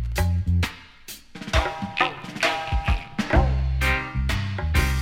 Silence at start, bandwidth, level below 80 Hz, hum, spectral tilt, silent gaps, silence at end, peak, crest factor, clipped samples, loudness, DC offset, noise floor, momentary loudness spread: 0 s; 16.5 kHz; -28 dBFS; none; -5 dB/octave; none; 0 s; -6 dBFS; 18 dB; under 0.1%; -24 LUFS; under 0.1%; -43 dBFS; 11 LU